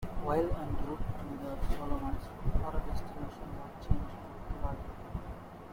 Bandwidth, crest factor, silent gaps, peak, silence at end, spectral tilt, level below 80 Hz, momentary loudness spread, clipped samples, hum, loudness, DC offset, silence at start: 16 kHz; 22 dB; none; -12 dBFS; 0 s; -8 dB/octave; -38 dBFS; 11 LU; under 0.1%; none; -39 LUFS; under 0.1%; 0 s